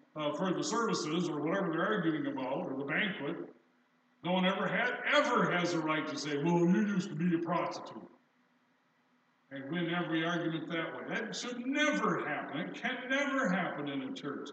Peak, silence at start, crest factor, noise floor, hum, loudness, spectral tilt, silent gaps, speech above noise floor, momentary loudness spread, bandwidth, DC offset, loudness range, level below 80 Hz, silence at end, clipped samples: -14 dBFS; 0.15 s; 20 dB; -72 dBFS; none; -33 LUFS; -5 dB/octave; none; 39 dB; 10 LU; 8.8 kHz; under 0.1%; 7 LU; under -90 dBFS; 0 s; under 0.1%